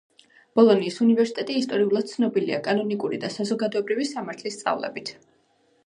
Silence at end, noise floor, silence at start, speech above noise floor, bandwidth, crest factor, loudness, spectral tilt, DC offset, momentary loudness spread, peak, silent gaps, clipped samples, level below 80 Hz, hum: 0.75 s; -64 dBFS; 0.55 s; 41 dB; 10.5 kHz; 20 dB; -24 LUFS; -5.5 dB/octave; under 0.1%; 11 LU; -4 dBFS; none; under 0.1%; -76 dBFS; none